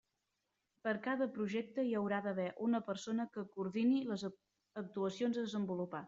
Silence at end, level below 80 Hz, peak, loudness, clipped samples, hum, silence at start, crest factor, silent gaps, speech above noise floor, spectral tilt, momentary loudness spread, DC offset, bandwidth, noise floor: 0 s; -82 dBFS; -22 dBFS; -39 LUFS; under 0.1%; none; 0.85 s; 16 dB; none; 48 dB; -5.5 dB/octave; 9 LU; under 0.1%; 7.8 kHz; -86 dBFS